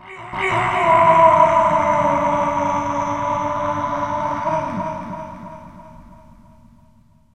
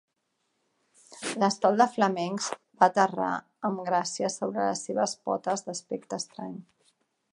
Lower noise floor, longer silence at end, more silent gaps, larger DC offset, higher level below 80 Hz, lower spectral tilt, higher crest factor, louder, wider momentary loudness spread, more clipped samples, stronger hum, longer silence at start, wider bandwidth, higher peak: second, -53 dBFS vs -78 dBFS; first, 1.2 s vs 0.7 s; neither; first, 0.3% vs under 0.1%; first, -48 dBFS vs -80 dBFS; first, -6 dB/octave vs -4 dB/octave; about the same, 18 dB vs 22 dB; first, -17 LUFS vs -28 LUFS; first, 19 LU vs 13 LU; neither; neither; second, 0.05 s vs 1.1 s; second, 9.8 kHz vs 11.5 kHz; first, 0 dBFS vs -6 dBFS